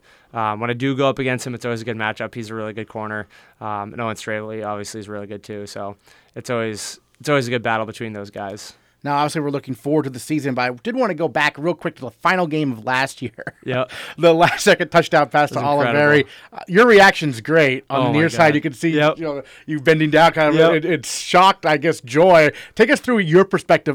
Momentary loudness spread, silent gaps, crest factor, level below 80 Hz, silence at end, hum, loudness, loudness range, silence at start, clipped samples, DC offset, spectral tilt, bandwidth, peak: 17 LU; none; 14 dB; -56 dBFS; 0 s; none; -17 LUFS; 13 LU; 0.35 s; under 0.1%; under 0.1%; -5 dB/octave; 18 kHz; -4 dBFS